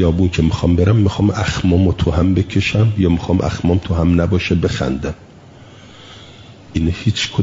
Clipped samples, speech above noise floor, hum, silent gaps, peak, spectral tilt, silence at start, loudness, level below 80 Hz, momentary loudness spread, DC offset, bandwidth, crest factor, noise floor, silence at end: under 0.1%; 25 dB; none; none; -2 dBFS; -7 dB/octave; 0 s; -16 LUFS; -34 dBFS; 6 LU; under 0.1%; 7.8 kHz; 12 dB; -40 dBFS; 0 s